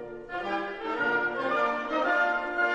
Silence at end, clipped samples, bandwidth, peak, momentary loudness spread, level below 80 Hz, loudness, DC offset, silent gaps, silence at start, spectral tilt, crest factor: 0 s; under 0.1%; 9 kHz; -14 dBFS; 8 LU; -60 dBFS; -28 LUFS; under 0.1%; none; 0 s; -4.5 dB/octave; 14 dB